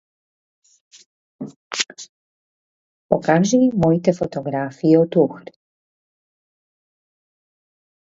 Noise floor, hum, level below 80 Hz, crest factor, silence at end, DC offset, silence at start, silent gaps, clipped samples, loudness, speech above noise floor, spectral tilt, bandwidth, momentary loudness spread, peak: under -90 dBFS; none; -58 dBFS; 22 dB; 2.7 s; under 0.1%; 1.4 s; 1.56-1.71 s, 2.09-3.09 s; under 0.1%; -19 LUFS; over 73 dB; -6 dB/octave; 8 kHz; 21 LU; 0 dBFS